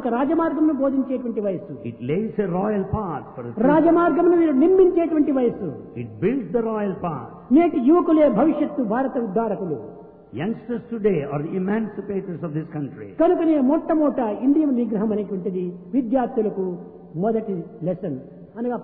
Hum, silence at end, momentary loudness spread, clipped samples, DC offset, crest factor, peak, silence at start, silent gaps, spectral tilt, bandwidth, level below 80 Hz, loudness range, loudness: none; 0 s; 14 LU; under 0.1%; under 0.1%; 14 dB; -6 dBFS; 0 s; none; -12.5 dB/octave; 3.8 kHz; -52 dBFS; 7 LU; -21 LUFS